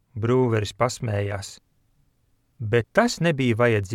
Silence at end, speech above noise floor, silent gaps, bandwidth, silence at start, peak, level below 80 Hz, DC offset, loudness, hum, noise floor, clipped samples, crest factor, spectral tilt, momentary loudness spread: 0 s; 44 dB; none; 14 kHz; 0.15 s; -4 dBFS; -54 dBFS; under 0.1%; -23 LUFS; none; -66 dBFS; under 0.1%; 20 dB; -6 dB/octave; 11 LU